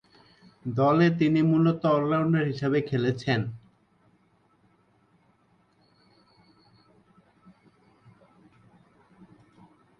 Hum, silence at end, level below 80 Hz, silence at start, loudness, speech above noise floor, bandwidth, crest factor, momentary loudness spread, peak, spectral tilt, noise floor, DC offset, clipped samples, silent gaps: none; 6.4 s; -64 dBFS; 0.65 s; -24 LUFS; 42 dB; 7 kHz; 18 dB; 11 LU; -10 dBFS; -8.5 dB/octave; -65 dBFS; under 0.1%; under 0.1%; none